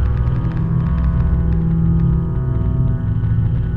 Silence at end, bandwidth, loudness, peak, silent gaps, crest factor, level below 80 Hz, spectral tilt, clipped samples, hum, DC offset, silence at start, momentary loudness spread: 0 s; 3.6 kHz; -18 LUFS; -6 dBFS; none; 10 dB; -20 dBFS; -11.5 dB/octave; under 0.1%; none; under 0.1%; 0 s; 3 LU